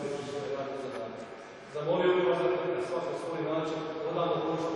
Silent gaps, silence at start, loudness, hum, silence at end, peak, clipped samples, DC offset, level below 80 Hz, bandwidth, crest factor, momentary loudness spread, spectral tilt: none; 0 s; -32 LUFS; none; 0 s; -16 dBFS; under 0.1%; under 0.1%; -70 dBFS; 11 kHz; 16 dB; 14 LU; -6 dB/octave